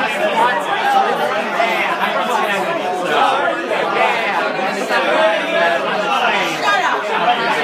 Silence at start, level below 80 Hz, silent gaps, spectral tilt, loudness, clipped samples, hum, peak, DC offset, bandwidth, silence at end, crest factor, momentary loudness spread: 0 s; -76 dBFS; none; -3 dB/octave; -16 LUFS; under 0.1%; none; -2 dBFS; under 0.1%; 15.5 kHz; 0 s; 14 dB; 3 LU